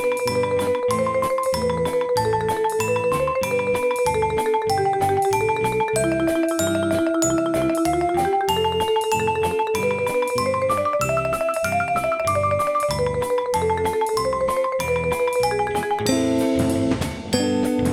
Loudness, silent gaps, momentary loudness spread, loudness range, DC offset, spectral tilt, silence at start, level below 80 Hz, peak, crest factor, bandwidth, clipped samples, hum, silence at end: -21 LUFS; none; 2 LU; 1 LU; under 0.1%; -5 dB/octave; 0 s; -44 dBFS; -6 dBFS; 14 dB; 18 kHz; under 0.1%; none; 0 s